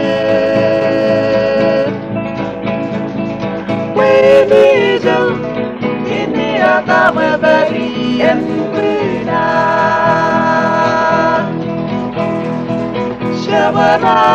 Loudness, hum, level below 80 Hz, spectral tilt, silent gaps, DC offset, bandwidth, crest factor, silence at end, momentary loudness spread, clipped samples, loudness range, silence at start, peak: -13 LUFS; none; -44 dBFS; -6.5 dB/octave; none; under 0.1%; 8.4 kHz; 12 dB; 0 s; 9 LU; under 0.1%; 3 LU; 0 s; 0 dBFS